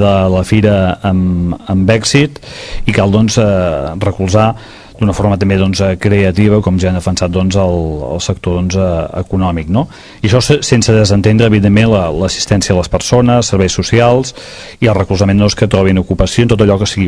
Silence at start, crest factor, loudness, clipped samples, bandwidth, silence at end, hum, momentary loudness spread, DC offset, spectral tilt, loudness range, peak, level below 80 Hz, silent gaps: 0 s; 10 dB; -11 LUFS; 0.6%; 11 kHz; 0 s; none; 7 LU; 0.3%; -6 dB/octave; 3 LU; 0 dBFS; -28 dBFS; none